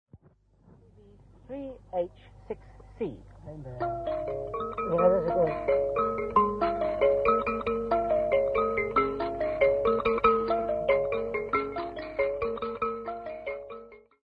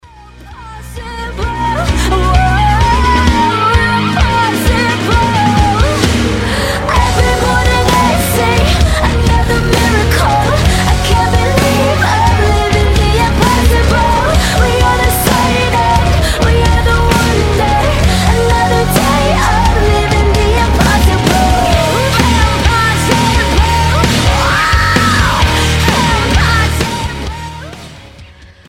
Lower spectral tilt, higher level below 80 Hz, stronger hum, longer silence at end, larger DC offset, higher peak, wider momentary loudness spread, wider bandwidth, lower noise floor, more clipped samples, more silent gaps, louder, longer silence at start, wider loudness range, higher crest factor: first, -8 dB/octave vs -5 dB/octave; second, -50 dBFS vs -16 dBFS; neither; about the same, 0.3 s vs 0.25 s; neither; second, -10 dBFS vs 0 dBFS; first, 16 LU vs 4 LU; second, 5.2 kHz vs 16.5 kHz; first, -62 dBFS vs -36 dBFS; neither; neither; second, -28 LUFS vs -11 LUFS; second, 0.15 s vs 0.35 s; first, 11 LU vs 1 LU; first, 18 dB vs 10 dB